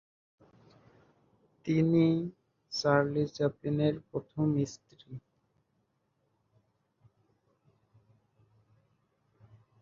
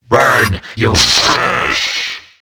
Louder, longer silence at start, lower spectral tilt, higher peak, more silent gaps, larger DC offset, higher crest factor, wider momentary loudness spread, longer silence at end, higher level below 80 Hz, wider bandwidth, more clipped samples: second, -30 LUFS vs -12 LUFS; first, 1.65 s vs 0.1 s; first, -7 dB/octave vs -2.5 dB/octave; second, -10 dBFS vs 0 dBFS; neither; neither; first, 24 dB vs 14 dB; first, 23 LU vs 8 LU; first, 4.6 s vs 0.2 s; second, -68 dBFS vs -34 dBFS; second, 7.4 kHz vs over 20 kHz; neither